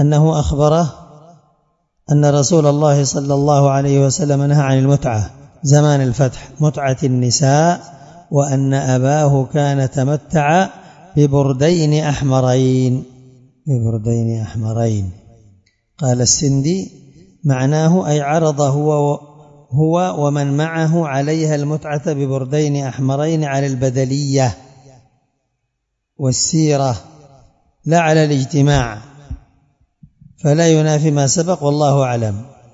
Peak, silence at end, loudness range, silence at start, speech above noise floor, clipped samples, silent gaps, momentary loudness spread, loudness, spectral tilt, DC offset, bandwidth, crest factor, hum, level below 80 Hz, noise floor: 0 dBFS; 0.25 s; 5 LU; 0 s; 59 dB; under 0.1%; none; 9 LU; -15 LUFS; -6 dB/octave; under 0.1%; 7.8 kHz; 16 dB; none; -42 dBFS; -73 dBFS